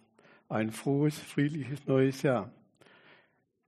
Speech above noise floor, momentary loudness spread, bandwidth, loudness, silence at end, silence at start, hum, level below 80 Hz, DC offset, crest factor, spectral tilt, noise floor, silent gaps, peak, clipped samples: 40 dB; 8 LU; 13 kHz; -31 LUFS; 1.15 s; 0.5 s; none; -72 dBFS; under 0.1%; 18 dB; -7 dB/octave; -69 dBFS; none; -14 dBFS; under 0.1%